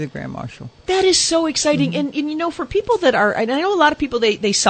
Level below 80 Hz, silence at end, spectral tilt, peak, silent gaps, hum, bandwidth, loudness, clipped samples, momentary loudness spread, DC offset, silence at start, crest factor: -48 dBFS; 0 s; -3 dB/octave; 0 dBFS; none; none; 9.2 kHz; -17 LUFS; under 0.1%; 14 LU; under 0.1%; 0 s; 18 dB